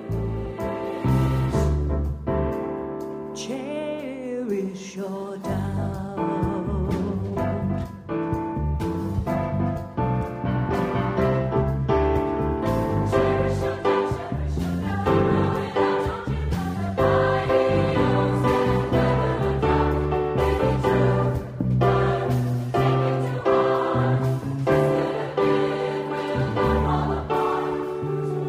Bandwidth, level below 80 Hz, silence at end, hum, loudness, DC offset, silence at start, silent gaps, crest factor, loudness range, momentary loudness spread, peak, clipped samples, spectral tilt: 15 kHz; -34 dBFS; 0 s; none; -24 LUFS; under 0.1%; 0 s; none; 16 dB; 6 LU; 9 LU; -6 dBFS; under 0.1%; -8 dB/octave